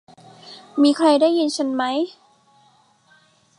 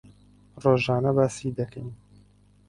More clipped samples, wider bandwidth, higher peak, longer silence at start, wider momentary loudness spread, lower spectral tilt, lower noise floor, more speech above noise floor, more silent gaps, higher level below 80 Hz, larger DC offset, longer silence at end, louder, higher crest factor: neither; about the same, 11 kHz vs 11.5 kHz; about the same, -4 dBFS vs -6 dBFS; about the same, 0.45 s vs 0.55 s; about the same, 17 LU vs 15 LU; second, -3.5 dB/octave vs -6.5 dB/octave; about the same, -57 dBFS vs -57 dBFS; first, 39 dB vs 33 dB; neither; second, -78 dBFS vs -56 dBFS; neither; first, 1.5 s vs 0.75 s; first, -19 LUFS vs -25 LUFS; about the same, 18 dB vs 22 dB